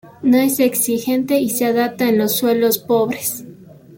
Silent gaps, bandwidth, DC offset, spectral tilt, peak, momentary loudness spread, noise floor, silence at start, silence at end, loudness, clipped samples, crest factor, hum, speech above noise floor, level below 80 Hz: none; 17 kHz; under 0.1%; -4 dB/octave; -4 dBFS; 5 LU; -40 dBFS; 0.05 s; 0 s; -17 LUFS; under 0.1%; 14 dB; none; 24 dB; -60 dBFS